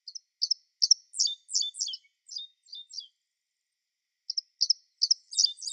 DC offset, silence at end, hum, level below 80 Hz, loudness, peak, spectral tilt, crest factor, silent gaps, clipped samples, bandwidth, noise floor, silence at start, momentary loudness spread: under 0.1%; 0 s; none; under -90 dBFS; -27 LUFS; -8 dBFS; 12 dB/octave; 24 dB; none; under 0.1%; 11 kHz; -85 dBFS; 0.05 s; 19 LU